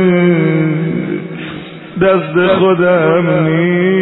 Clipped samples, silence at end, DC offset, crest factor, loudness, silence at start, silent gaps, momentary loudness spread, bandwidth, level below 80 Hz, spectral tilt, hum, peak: under 0.1%; 0 s; under 0.1%; 12 dB; -12 LUFS; 0 s; none; 14 LU; 4.1 kHz; -48 dBFS; -11.5 dB/octave; none; 0 dBFS